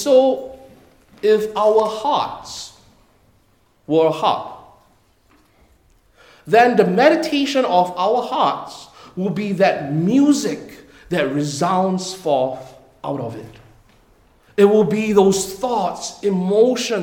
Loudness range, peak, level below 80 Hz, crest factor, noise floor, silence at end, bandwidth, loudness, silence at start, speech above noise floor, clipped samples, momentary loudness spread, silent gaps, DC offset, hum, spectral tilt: 7 LU; -2 dBFS; -56 dBFS; 18 dB; -58 dBFS; 0 s; 18 kHz; -18 LUFS; 0 s; 41 dB; under 0.1%; 16 LU; none; under 0.1%; none; -5 dB/octave